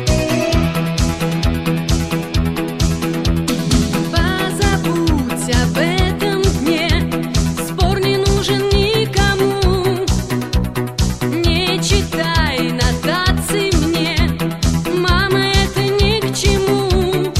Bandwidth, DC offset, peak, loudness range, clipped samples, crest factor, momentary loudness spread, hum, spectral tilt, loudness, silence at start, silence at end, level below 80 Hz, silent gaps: 16 kHz; under 0.1%; 0 dBFS; 2 LU; under 0.1%; 14 dB; 4 LU; none; -5 dB/octave; -16 LUFS; 0 s; 0 s; -24 dBFS; none